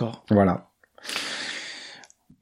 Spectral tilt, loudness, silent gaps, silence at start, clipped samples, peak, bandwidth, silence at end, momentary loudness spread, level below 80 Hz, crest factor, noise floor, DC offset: -5.5 dB/octave; -26 LUFS; none; 0 s; under 0.1%; -6 dBFS; 15.5 kHz; 0.35 s; 20 LU; -62 dBFS; 22 dB; -50 dBFS; under 0.1%